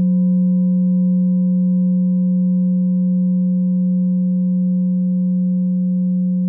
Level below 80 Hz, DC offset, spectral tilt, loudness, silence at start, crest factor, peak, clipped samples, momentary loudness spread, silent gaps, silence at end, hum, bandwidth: -82 dBFS; under 0.1%; -19 dB/octave; -17 LUFS; 0 s; 4 dB; -10 dBFS; under 0.1%; 2 LU; none; 0 s; none; 1 kHz